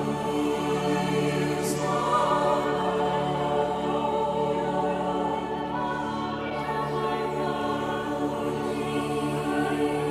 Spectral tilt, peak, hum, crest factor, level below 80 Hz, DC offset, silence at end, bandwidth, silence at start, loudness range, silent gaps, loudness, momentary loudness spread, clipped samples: -5.5 dB/octave; -10 dBFS; none; 16 dB; -52 dBFS; under 0.1%; 0 s; 15.5 kHz; 0 s; 3 LU; none; -27 LUFS; 5 LU; under 0.1%